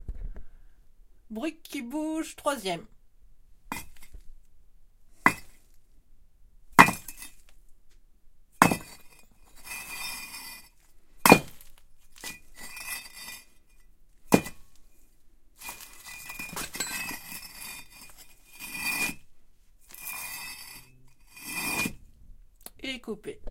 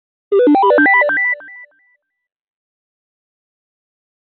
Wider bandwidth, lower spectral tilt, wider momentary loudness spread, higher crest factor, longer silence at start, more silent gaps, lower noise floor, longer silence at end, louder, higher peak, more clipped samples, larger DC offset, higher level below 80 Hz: first, 17 kHz vs 4.3 kHz; first, -3.5 dB/octave vs -1.5 dB/octave; first, 24 LU vs 8 LU; first, 32 dB vs 14 dB; second, 0 s vs 0.3 s; neither; second, -54 dBFS vs -60 dBFS; second, 0 s vs 2.7 s; second, -28 LUFS vs -12 LUFS; first, 0 dBFS vs -4 dBFS; neither; neither; first, -52 dBFS vs -70 dBFS